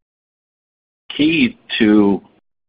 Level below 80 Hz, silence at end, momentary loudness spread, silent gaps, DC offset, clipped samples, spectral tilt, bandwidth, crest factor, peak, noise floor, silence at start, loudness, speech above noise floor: -50 dBFS; 0.5 s; 10 LU; none; under 0.1%; under 0.1%; -10.5 dB/octave; 5 kHz; 18 dB; 0 dBFS; under -90 dBFS; 1.1 s; -15 LUFS; over 76 dB